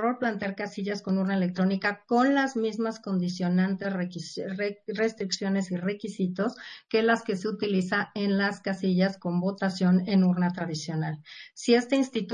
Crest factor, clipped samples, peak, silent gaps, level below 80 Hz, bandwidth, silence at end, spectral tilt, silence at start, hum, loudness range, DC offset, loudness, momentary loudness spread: 18 dB; under 0.1%; -10 dBFS; none; -72 dBFS; 9.8 kHz; 0 s; -6 dB/octave; 0 s; none; 3 LU; under 0.1%; -27 LUFS; 9 LU